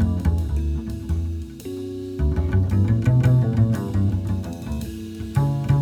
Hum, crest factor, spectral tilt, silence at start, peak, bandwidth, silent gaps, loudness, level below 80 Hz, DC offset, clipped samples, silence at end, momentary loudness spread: none; 14 dB; -8.5 dB/octave; 0 s; -8 dBFS; 15 kHz; none; -23 LUFS; -30 dBFS; under 0.1%; under 0.1%; 0 s; 13 LU